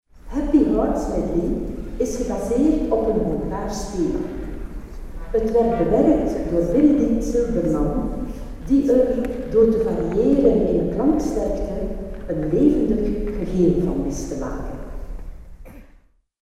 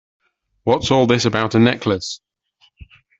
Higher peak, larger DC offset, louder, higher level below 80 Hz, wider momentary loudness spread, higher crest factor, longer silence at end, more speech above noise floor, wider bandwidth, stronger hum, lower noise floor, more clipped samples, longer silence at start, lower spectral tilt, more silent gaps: second, -4 dBFS vs 0 dBFS; neither; second, -21 LUFS vs -17 LUFS; first, -32 dBFS vs -50 dBFS; first, 15 LU vs 11 LU; about the same, 16 dB vs 18 dB; second, 0.6 s vs 1.05 s; second, 34 dB vs 43 dB; first, 13 kHz vs 8 kHz; neither; second, -53 dBFS vs -59 dBFS; neither; second, 0.15 s vs 0.65 s; first, -8 dB/octave vs -5.5 dB/octave; neither